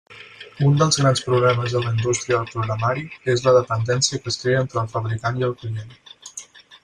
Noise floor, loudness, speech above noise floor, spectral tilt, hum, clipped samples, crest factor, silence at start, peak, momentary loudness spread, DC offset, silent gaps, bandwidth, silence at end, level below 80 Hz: -42 dBFS; -20 LUFS; 22 dB; -5 dB/octave; none; under 0.1%; 16 dB; 0.1 s; -4 dBFS; 19 LU; under 0.1%; none; 11 kHz; 0.05 s; -54 dBFS